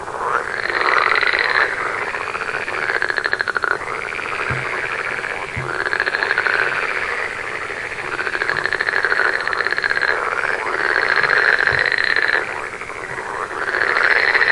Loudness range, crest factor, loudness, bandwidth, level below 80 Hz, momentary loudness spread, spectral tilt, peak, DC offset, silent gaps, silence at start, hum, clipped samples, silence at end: 4 LU; 18 dB; -18 LUFS; 11.5 kHz; -50 dBFS; 10 LU; -3 dB/octave; 0 dBFS; under 0.1%; none; 0 s; none; under 0.1%; 0 s